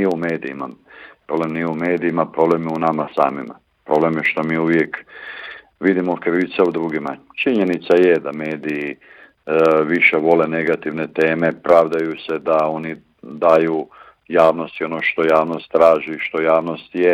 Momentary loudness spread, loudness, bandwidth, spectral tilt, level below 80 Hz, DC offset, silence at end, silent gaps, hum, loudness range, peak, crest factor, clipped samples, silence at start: 15 LU; -18 LUFS; 10.5 kHz; -7.5 dB/octave; -62 dBFS; under 0.1%; 0 s; none; none; 4 LU; -2 dBFS; 16 dB; under 0.1%; 0 s